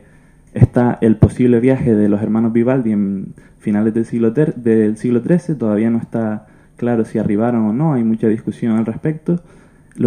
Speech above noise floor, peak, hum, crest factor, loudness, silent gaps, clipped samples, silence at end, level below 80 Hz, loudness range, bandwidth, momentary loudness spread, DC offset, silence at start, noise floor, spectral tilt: 31 dB; 0 dBFS; none; 16 dB; -16 LUFS; none; under 0.1%; 0 s; -40 dBFS; 3 LU; 9.8 kHz; 8 LU; under 0.1%; 0.55 s; -46 dBFS; -9.5 dB/octave